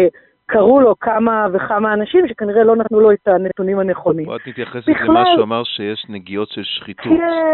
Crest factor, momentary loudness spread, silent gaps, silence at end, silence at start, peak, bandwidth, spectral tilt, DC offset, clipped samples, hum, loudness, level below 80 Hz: 14 dB; 12 LU; none; 0 s; 0 s; -2 dBFS; 4.3 kHz; -3.5 dB/octave; under 0.1%; under 0.1%; none; -15 LUFS; -52 dBFS